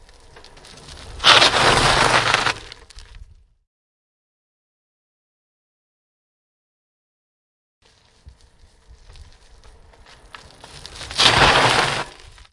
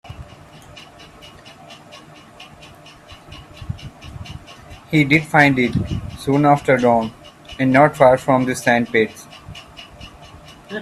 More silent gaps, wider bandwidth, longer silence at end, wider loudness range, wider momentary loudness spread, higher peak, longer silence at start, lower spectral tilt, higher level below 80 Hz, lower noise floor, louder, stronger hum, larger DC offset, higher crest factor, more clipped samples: first, 3.67-7.81 s vs none; second, 12 kHz vs 14 kHz; first, 0.4 s vs 0 s; second, 11 LU vs 21 LU; about the same, 25 LU vs 26 LU; about the same, 0 dBFS vs 0 dBFS; first, 0.9 s vs 0.05 s; second, -2 dB/octave vs -6 dB/octave; about the same, -42 dBFS vs -44 dBFS; first, -52 dBFS vs -42 dBFS; about the same, -14 LUFS vs -16 LUFS; neither; neither; about the same, 22 dB vs 20 dB; neither